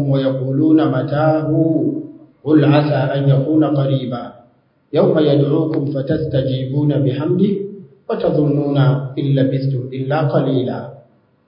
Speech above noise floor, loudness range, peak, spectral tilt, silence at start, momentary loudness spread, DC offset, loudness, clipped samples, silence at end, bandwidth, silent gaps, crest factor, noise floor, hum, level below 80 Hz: 39 dB; 2 LU; 0 dBFS; -13.5 dB/octave; 0 s; 11 LU; under 0.1%; -16 LUFS; under 0.1%; 0.5 s; 5.4 kHz; none; 16 dB; -54 dBFS; none; -52 dBFS